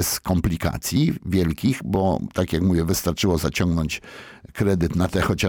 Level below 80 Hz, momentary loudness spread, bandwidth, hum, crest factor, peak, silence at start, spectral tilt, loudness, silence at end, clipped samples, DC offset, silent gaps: -36 dBFS; 4 LU; 19 kHz; none; 12 dB; -8 dBFS; 0 s; -5.5 dB/octave; -22 LUFS; 0 s; under 0.1%; under 0.1%; none